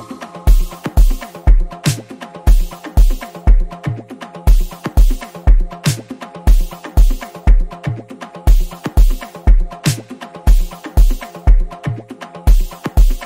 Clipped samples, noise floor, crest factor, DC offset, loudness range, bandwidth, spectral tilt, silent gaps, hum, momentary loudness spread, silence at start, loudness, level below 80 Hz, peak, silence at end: under 0.1%; -32 dBFS; 12 dB; under 0.1%; 1 LU; 16 kHz; -5.5 dB/octave; none; none; 9 LU; 0 s; -18 LUFS; -12 dBFS; 0 dBFS; 0 s